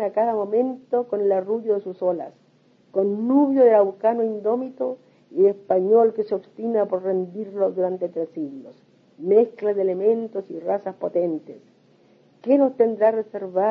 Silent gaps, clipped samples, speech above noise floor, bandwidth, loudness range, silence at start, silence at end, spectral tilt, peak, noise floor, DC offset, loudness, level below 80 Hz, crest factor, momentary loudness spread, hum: none; under 0.1%; 37 dB; 5 kHz; 4 LU; 0 s; 0 s; -10 dB/octave; -6 dBFS; -58 dBFS; under 0.1%; -22 LUFS; -80 dBFS; 16 dB; 12 LU; none